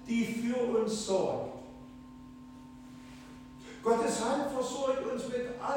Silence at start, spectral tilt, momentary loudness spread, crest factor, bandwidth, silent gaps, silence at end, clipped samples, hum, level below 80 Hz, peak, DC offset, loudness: 0 s; -4.5 dB/octave; 20 LU; 16 dB; 17 kHz; none; 0 s; under 0.1%; none; -62 dBFS; -16 dBFS; under 0.1%; -32 LUFS